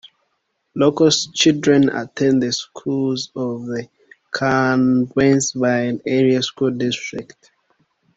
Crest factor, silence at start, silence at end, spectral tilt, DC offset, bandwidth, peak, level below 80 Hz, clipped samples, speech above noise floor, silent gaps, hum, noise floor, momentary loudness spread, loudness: 16 dB; 0.75 s; 0.95 s; -4.5 dB/octave; under 0.1%; 8 kHz; -2 dBFS; -56 dBFS; under 0.1%; 53 dB; none; none; -71 dBFS; 11 LU; -18 LUFS